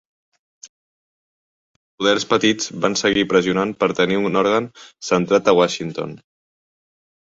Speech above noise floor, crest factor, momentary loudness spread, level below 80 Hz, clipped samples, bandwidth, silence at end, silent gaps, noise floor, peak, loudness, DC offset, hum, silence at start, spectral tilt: over 72 dB; 18 dB; 11 LU; -56 dBFS; under 0.1%; 8 kHz; 1.05 s; 0.69-1.98 s; under -90 dBFS; -2 dBFS; -18 LUFS; under 0.1%; none; 0.65 s; -4 dB/octave